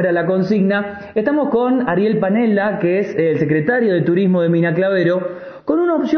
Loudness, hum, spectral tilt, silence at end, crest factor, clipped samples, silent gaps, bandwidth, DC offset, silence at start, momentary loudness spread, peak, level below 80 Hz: -16 LUFS; none; -9 dB/octave; 0 s; 12 dB; under 0.1%; none; 6.4 kHz; under 0.1%; 0 s; 5 LU; -4 dBFS; -56 dBFS